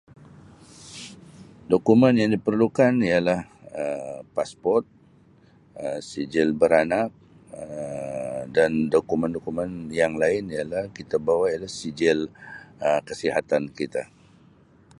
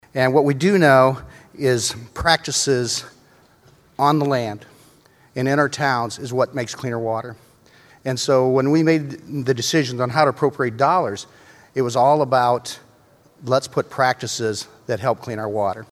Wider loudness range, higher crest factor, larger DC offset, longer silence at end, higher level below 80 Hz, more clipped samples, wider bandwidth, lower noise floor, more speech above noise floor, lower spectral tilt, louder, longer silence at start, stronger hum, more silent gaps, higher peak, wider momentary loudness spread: about the same, 5 LU vs 5 LU; about the same, 22 dB vs 20 dB; neither; first, 0.95 s vs 0.1 s; second, -58 dBFS vs -52 dBFS; neither; second, 11.5 kHz vs 14.5 kHz; about the same, -55 dBFS vs -53 dBFS; about the same, 32 dB vs 34 dB; first, -6 dB/octave vs -4.5 dB/octave; second, -24 LUFS vs -20 LUFS; first, 0.8 s vs 0.15 s; neither; neither; second, -4 dBFS vs 0 dBFS; first, 16 LU vs 13 LU